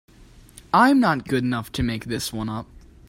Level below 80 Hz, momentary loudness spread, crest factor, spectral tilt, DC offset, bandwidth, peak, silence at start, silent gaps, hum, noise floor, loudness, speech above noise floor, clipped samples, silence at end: -46 dBFS; 13 LU; 20 dB; -5.5 dB/octave; under 0.1%; 16 kHz; -4 dBFS; 0.2 s; none; none; -48 dBFS; -22 LUFS; 27 dB; under 0.1%; 0.45 s